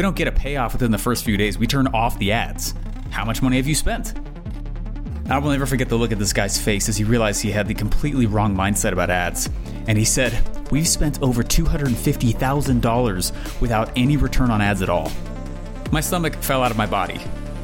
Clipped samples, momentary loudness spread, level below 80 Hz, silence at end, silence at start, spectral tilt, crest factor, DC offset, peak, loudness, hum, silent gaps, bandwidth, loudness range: under 0.1%; 11 LU; -26 dBFS; 0 s; 0 s; -4.5 dB/octave; 14 dB; under 0.1%; -6 dBFS; -21 LUFS; none; none; 17 kHz; 3 LU